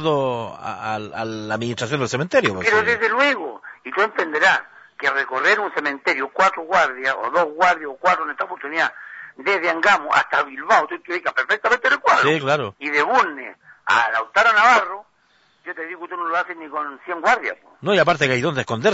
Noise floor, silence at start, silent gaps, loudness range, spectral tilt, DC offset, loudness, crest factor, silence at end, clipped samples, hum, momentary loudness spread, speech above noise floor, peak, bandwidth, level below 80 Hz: -60 dBFS; 0 s; none; 3 LU; -4 dB/octave; under 0.1%; -19 LUFS; 16 dB; 0 s; under 0.1%; none; 13 LU; 40 dB; -4 dBFS; 8 kHz; -62 dBFS